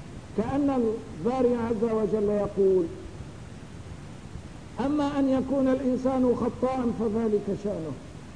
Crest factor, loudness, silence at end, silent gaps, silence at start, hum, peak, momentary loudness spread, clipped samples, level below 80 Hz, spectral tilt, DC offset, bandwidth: 14 dB; -27 LUFS; 0 s; none; 0 s; none; -12 dBFS; 18 LU; under 0.1%; -48 dBFS; -8 dB/octave; 0.3%; 10.5 kHz